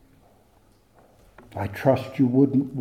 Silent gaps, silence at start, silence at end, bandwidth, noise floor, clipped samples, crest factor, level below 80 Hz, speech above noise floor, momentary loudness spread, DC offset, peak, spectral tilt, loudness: none; 1.55 s; 0 s; 14.5 kHz; -59 dBFS; under 0.1%; 20 dB; -60 dBFS; 37 dB; 13 LU; under 0.1%; -6 dBFS; -9 dB/octave; -22 LUFS